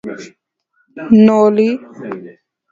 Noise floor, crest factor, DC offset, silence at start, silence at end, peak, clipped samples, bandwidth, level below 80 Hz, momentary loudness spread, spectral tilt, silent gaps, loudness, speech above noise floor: -62 dBFS; 14 dB; under 0.1%; 0.05 s; 0.4 s; 0 dBFS; under 0.1%; 7.4 kHz; -58 dBFS; 22 LU; -8 dB/octave; none; -11 LUFS; 49 dB